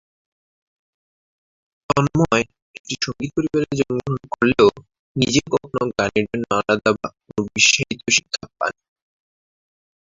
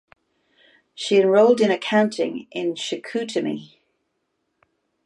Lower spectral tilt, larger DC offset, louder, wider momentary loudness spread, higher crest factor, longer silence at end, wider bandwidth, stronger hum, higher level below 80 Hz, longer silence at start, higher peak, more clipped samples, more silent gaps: about the same, -4 dB/octave vs -5 dB/octave; neither; about the same, -20 LUFS vs -21 LUFS; about the same, 12 LU vs 13 LU; about the same, 20 dB vs 18 dB; about the same, 1.4 s vs 1.4 s; second, 7.8 kHz vs 11 kHz; neither; first, -50 dBFS vs -74 dBFS; first, 1.9 s vs 1 s; first, -2 dBFS vs -6 dBFS; neither; first, 2.62-2.85 s, 4.99-5.15 s vs none